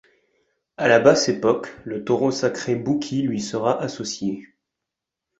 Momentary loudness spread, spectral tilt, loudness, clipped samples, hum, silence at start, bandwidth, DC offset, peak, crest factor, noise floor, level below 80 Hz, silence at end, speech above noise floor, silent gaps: 13 LU; -4.5 dB/octave; -21 LUFS; under 0.1%; none; 0.8 s; 8.2 kHz; under 0.1%; -2 dBFS; 20 dB; -85 dBFS; -60 dBFS; 0.95 s; 64 dB; none